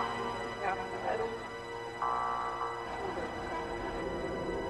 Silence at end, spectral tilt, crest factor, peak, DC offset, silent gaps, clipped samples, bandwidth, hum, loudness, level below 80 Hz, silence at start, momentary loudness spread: 0 s; -5 dB/octave; 18 dB; -20 dBFS; under 0.1%; none; under 0.1%; 12.5 kHz; none; -36 LUFS; -54 dBFS; 0 s; 4 LU